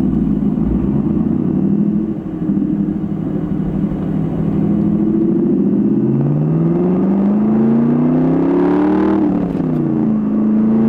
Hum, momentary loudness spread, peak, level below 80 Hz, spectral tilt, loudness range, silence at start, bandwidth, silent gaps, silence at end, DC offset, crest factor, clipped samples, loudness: none; 5 LU; -4 dBFS; -34 dBFS; -11.5 dB/octave; 4 LU; 0 s; 3.9 kHz; none; 0 s; under 0.1%; 10 dB; under 0.1%; -15 LUFS